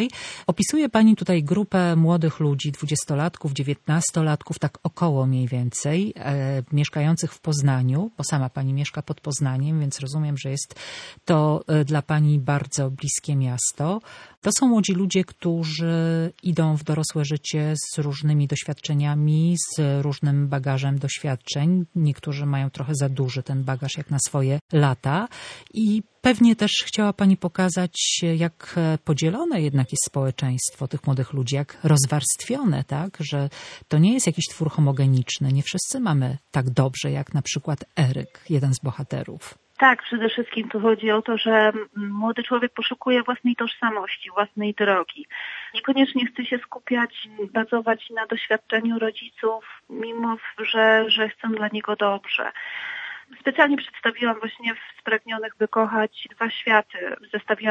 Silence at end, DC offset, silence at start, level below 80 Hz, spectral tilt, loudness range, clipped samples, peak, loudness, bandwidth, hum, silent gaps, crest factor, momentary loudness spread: 0 s; under 0.1%; 0 s; -62 dBFS; -5 dB/octave; 3 LU; under 0.1%; -2 dBFS; -23 LUFS; 11 kHz; none; 14.37-14.42 s, 24.61-24.69 s; 22 dB; 9 LU